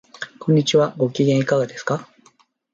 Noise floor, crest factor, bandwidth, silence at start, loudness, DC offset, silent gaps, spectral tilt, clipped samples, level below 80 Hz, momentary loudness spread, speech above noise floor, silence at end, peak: -57 dBFS; 16 dB; 7.8 kHz; 0.2 s; -20 LUFS; under 0.1%; none; -6 dB/octave; under 0.1%; -64 dBFS; 11 LU; 39 dB; 0.7 s; -4 dBFS